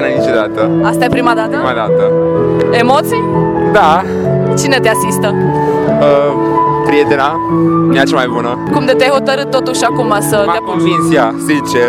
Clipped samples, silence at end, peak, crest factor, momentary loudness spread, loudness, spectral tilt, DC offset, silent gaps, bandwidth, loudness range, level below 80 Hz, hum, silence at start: 0.1%; 0 s; 0 dBFS; 10 dB; 4 LU; -11 LUFS; -5.5 dB/octave; under 0.1%; none; 18.5 kHz; 1 LU; -42 dBFS; none; 0 s